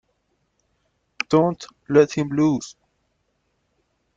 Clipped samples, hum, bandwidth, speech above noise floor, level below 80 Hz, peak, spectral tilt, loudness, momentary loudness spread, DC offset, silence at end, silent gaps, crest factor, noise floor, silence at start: under 0.1%; none; 7.8 kHz; 51 dB; -60 dBFS; -2 dBFS; -6.5 dB/octave; -20 LUFS; 14 LU; under 0.1%; 1.45 s; none; 22 dB; -71 dBFS; 1.3 s